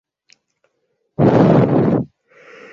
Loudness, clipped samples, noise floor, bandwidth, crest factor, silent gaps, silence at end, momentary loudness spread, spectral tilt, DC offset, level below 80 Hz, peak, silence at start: -14 LUFS; under 0.1%; -69 dBFS; 7.2 kHz; 16 dB; none; 0.7 s; 18 LU; -10 dB/octave; under 0.1%; -48 dBFS; 0 dBFS; 1.2 s